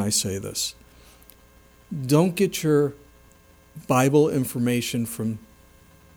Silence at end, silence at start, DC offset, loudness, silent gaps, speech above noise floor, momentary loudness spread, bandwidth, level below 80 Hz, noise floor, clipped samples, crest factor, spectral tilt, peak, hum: 0.7 s; 0 s; under 0.1%; -23 LUFS; none; 31 dB; 12 LU; over 20 kHz; -56 dBFS; -54 dBFS; under 0.1%; 18 dB; -5 dB/octave; -6 dBFS; 60 Hz at -50 dBFS